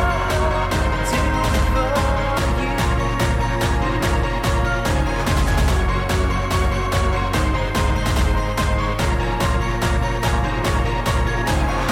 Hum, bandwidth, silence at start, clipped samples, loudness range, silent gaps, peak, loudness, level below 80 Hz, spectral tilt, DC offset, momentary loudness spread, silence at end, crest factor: none; 16.5 kHz; 0 s; under 0.1%; 1 LU; none; -8 dBFS; -20 LUFS; -22 dBFS; -5.5 dB/octave; under 0.1%; 2 LU; 0 s; 12 dB